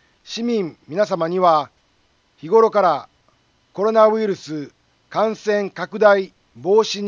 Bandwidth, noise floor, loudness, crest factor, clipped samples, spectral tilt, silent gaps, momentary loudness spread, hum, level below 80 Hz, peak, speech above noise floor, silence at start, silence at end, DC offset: 7.4 kHz; -61 dBFS; -18 LUFS; 18 dB; under 0.1%; -5 dB/octave; none; 16 LU; none; -70 dBFS; -2 dBFS; 44 dB; 0.25 s; 0 s; under 0.1%